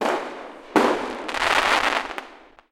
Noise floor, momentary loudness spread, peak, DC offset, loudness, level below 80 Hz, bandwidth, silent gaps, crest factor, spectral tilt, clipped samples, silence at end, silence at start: -46 dBFS; 16 LU; -4 dBFS; under 0.1%; -22 LUFS; -52 dBFS; 17 kHz; none; 20 dB; -2.5 dB/octave; under 0.1%; 0.35 s; 0 s